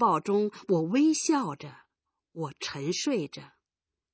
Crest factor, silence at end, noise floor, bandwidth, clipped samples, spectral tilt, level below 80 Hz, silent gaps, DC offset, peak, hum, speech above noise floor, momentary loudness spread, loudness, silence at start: 16 dB; 0.65 s; under -90 dBFS; 8 kHz; under 0.1%; -4.5 dB/octave; -76 dBFS; none; under 0.1%; -12 dBFS; none; over 62 dB; 19 LU; -28 LUFS; 0 s